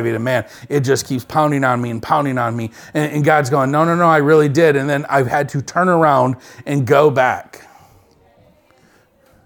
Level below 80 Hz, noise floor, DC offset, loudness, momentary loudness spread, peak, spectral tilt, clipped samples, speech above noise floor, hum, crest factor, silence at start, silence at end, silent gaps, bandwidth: -56 dBFS; -53 dBFS; under 0.1%; -16 LUFS; 9 LU; 0 dBFS; -6.5 dB/octave; under 0.1%; 38 dB; none; 16 dB; 0 s; 2.05 s; none; 19 kHz